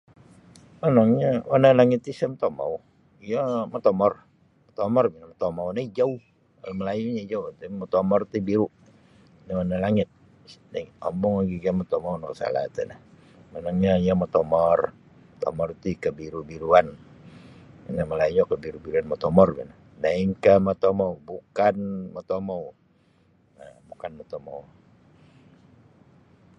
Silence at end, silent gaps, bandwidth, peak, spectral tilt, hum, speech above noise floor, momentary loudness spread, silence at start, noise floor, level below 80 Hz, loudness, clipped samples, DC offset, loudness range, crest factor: 1.95 s; none; 9.4 kHz; -2 dBFS; -8.5 dB/octave; none; 38 dB; 17 LU; 0.85 s; -61 dBFS; -52 dBFS; -24 LUFS; under 0.1%; under 0.1%; 8 LU; 22 dB